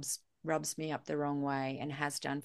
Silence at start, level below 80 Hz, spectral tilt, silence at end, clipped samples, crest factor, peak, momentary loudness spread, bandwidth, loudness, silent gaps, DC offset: 0 s; -78 dBFS; -4 dB/octave; 0 s; under 0.1%; 20 dB; -16 dBFS; 4 LU; 12.5 kHz; -37 LUFS; none; under 0.1%